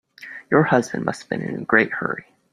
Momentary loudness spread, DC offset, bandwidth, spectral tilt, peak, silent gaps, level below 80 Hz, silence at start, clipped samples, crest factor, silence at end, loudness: 15 LU; under 0.1%; 14 kHz; -6.5 dB/octave; -2 dBFS; none; -60 dBFS; 0.2 s; under 0.1%; 20 dB; 0.3 s; -21 LUFS